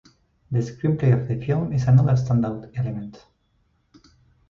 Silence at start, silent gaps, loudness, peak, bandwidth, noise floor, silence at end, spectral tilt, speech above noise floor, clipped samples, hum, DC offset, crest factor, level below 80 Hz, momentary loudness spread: 0.5 s; none; -22 LUFS; -6 dBFS; 7 kHz; -66 dBFS; 1.3 s; -9 dB/octave; 45 dB; under 0.1%; none; under 0.1%; 16 dB; -48 dBFS; 11 LU